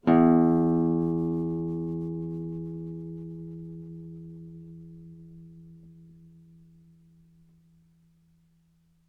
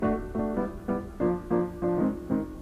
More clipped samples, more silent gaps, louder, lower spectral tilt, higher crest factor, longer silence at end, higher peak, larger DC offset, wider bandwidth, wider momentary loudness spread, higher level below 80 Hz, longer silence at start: neither; neither; about the same, -27 LUFS vs -29 LUFS; first, -11 dB/octave vs -9.5 dB/octave; about the same, 20 dB vs 16 dB; first, 3.05 s vs 0 s; about the same, -10 dBFS vs -12 dBFS; neither; second, 4.3 kHz vs 13.5 kHz; first, 27 LU vs 5 LU; second, -62 dBFS vs -44 dBFS; about the same, 0.05 s vs 0 s